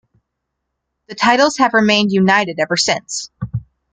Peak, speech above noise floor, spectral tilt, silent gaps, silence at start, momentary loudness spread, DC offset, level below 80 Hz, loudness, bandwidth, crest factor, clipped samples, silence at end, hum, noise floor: 0 dBFS; 61 dB; -4 dB/octave; none; 1.1 s; 14 LU; under 0.1%; -50 dBFS; -14 LUFS; 9.4 kHz; 16 dB; under 0.1%; 0.3 s; none; -76 dBFS